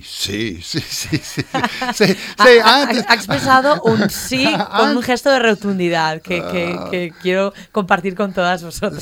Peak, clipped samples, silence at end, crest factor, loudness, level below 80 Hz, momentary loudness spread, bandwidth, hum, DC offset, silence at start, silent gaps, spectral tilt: 0 dBFS; under 0.1%; 0 s; 16 dB; -15 LUFS; -48 dBFS; 11 LU; 18 kHz; none; under 0.1%; 0.05 s; none; -4 dB/octave